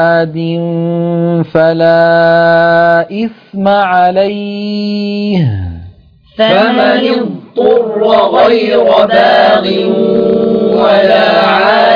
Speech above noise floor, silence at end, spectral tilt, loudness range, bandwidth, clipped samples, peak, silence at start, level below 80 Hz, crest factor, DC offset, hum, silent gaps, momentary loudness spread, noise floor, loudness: 29 dB; 0 s; -8 dB/octave; 4 LU; 5.4 kHz; 0.3%; 0 dBFS; 0 s; -46 dBFS; 8 dB; under 0.1%; none; none; 8 LU; -38 dBFS; -9 LUFS